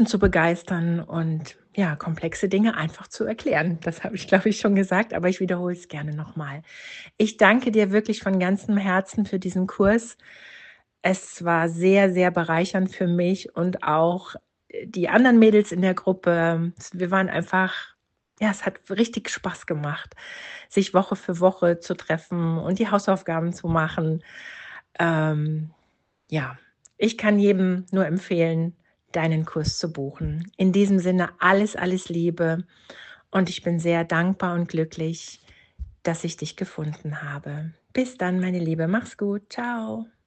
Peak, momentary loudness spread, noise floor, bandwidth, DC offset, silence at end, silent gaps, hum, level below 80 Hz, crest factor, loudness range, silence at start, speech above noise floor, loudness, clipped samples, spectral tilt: -2 dBFS; 14 LU; -69 dBFS; 8.8 kHz; under 0.1%; 0.25 s; none; none; -50 dBFS; 22 dB; 6 LU; 0 s; 46 dB; -23 LUFS; under 0.1%; -6.5 dB/octave